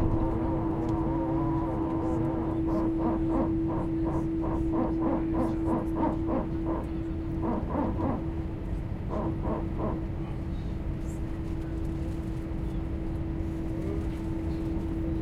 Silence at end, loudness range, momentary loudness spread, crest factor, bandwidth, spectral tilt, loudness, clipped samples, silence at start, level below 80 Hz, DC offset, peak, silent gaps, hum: 0 s; 5 LU; 7 LU; 16 dB; 8.6 kHz; -9.5 dB/octave; -31 LUFS; under 0.1%; 0 s; -36 dBFS; under 0.1%; -14 dBFS; none; none